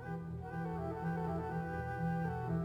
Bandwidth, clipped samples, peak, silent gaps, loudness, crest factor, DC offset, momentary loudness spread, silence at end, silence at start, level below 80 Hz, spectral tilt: 5.8 kHz; under 0.1%; -26 dBFS; none; -40 LUFS; 12 dB; under 0.1%; 6 LU; 0 s; 0 s; -56 dBFS; -9.5 dB/octave